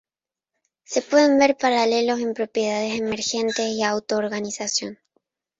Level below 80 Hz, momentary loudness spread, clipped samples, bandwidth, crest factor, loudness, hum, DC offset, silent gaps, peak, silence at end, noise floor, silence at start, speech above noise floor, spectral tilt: -66 dBFS; 9 LU; under 0.1%; 8.2 kHz; 18 dB; -22 LUFS; none; under 0.1%; none; -4 dBFS; 0.65 s; under -90 dBFS; 0.9 s; over 69 dB; -3 dB/octave